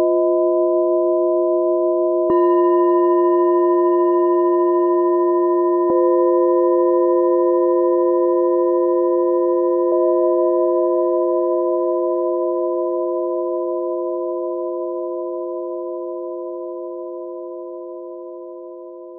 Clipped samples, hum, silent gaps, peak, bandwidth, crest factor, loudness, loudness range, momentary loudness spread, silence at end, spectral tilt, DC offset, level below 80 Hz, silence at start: under 0.1%; none; none; -6 dBFS; 1.9 kHz; 10 dB; -17 LUFS; 11 LU; 14 LU; 0 s; -11.5 dB/octave; under 0.1%; -68 dBFS; 0 s